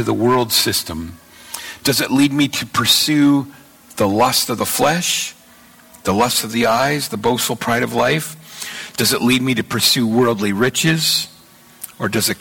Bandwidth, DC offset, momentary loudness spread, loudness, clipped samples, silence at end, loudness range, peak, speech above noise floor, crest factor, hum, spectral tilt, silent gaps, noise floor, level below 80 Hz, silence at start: 17.5 kHz; under 0.1%; 15 LU; -16 LUFS; under 0.1%; 0.05 s; 2 LU; -4 dBFS; 29 dB; 14 dB; none; -3.5 dB/octave; none; -46 dBFS; -50 dBFS; 0 s